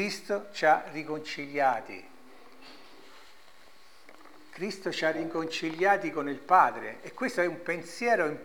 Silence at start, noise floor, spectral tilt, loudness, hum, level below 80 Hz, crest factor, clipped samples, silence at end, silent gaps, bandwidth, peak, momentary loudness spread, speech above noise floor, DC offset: 0 s; -58 dBFS; -4 dB/octave; -29 LUFS; none; -74 dBFS; 22 dB; under 0.1%; 0 s; none; 19 kHz; -8 dBFS; 14 LU; 29 dB; 0.3%